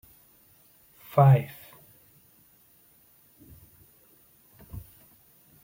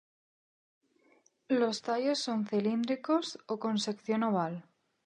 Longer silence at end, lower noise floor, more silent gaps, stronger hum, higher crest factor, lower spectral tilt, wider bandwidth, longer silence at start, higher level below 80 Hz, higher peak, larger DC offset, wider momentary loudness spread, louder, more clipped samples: first, 0.85 s vs 0.45 s; second, -60 dBFS vs -68 dBFS; neither; neither; first, 24 dB vs 16 dB; first, -9 dB/octave vs -5 dB/octave; first, 17 kHz vs 10.5 kHz; second, 1.15 s vs 1.5 s; first, -60 dBFS vs -86 dBFS; first, -6 dBFS vs -16 dBFS; neither; first, 27 LU vs 5 LU; first, -22 LUFS vs -32 LUFS; neither